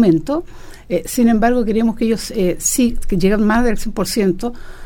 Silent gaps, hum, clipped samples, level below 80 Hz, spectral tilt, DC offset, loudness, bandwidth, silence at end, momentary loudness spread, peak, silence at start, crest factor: none; none; under 0.1%; -28 dBFS; -5 dB/octave; under 0.1%; -17 LUFS; 18 kHz; 0 s; 9 LU; -2 dBFS; 0 s; 14 dB